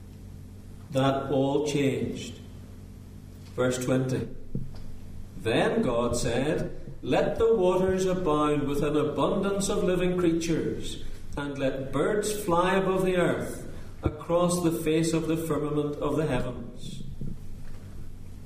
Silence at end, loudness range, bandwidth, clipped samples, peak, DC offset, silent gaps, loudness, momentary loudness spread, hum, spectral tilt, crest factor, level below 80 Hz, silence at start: 0 s; 5 LU; 15.5 kHz; under 0.1%; -10 dBFS; under 0.1%; none; -27 LUFS; 20 LU; none; -5.5 dB/octave; 16 dB; -40 dBFS; 0 s